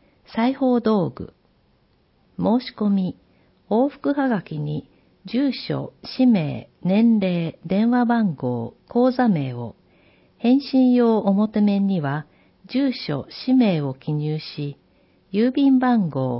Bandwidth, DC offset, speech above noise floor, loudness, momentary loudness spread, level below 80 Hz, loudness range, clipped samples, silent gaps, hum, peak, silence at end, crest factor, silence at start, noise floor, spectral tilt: 5.8 kHz; under 0.1%; 41 dB; -21 LUFS; 12 LU; -60 dBFS; 4 LU; under 0.1%; none; none; -6 dBFS; 0 s; 14 dB; 0.3 s; -61 dBFS; -12 dB/octave